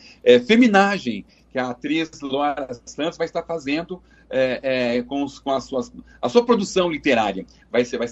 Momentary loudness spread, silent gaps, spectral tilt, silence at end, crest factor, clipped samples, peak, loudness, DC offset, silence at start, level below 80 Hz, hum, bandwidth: 14 LU; none; -5 dB/octave; 0 s; 20 dB; under 0.1%; 0 dBFS; -21 LUFS; under 0.1%; 0.25 s; -54 dBFS; none; 8.2 kHz